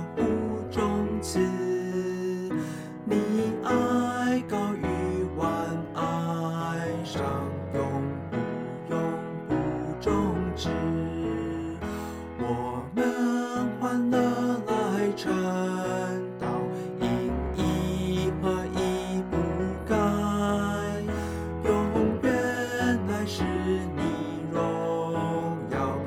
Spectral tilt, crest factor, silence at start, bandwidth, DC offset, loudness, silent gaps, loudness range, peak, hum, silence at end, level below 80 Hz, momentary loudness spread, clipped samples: -6.5 dB/octave; 16 dB; 0 s; 16 kHz; under 0.1%; -28 LUFS; none; 3 LU; -12 dBFS; none; 0 s; -44 dBFS; 6 LU; under 0.1%